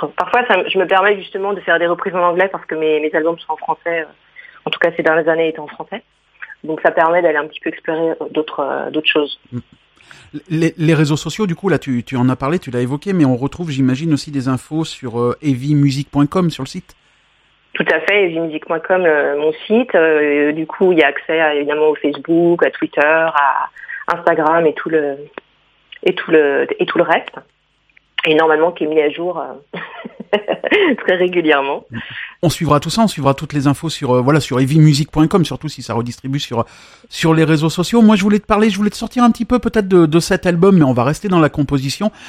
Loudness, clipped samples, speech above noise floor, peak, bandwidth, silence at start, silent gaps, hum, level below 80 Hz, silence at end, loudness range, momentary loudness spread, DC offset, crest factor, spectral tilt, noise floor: -15 LUFS; under 0.1%; 41 dB; 0 dBFS; 15 kHz; 0 s; none; none; -46 dBFS; 0 s; 5 LU; 12 LU; under 0.1%; 16 dB; -6 dB/octave; -56 dBFS